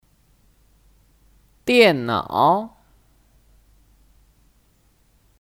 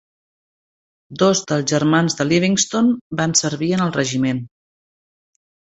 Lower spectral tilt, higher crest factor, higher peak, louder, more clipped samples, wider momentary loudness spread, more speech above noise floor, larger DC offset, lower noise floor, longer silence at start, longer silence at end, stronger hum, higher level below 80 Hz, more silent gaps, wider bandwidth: about the same, -5 dB/octave vs -4 dB/octave; about the same, 22 dB vs 18 dB; about the same, -2 dBFS vs -2 dBFS; about the same, -18 LUFS vs -18 LUFS; neither; first, 14 LU vs 5 LU; second, 43 dB vs over 72 dB; neither; second, -60 dBFS vs under -90 dBFS; first, 1.65 s vs 1.1 s; first, 2.75 s vs 1.3 s; neither; about the same, -58 dBFS vs -56 dBFS; second, none vs 3.01-3.10 s; first, 16.5 kHz vs 8.4 kHz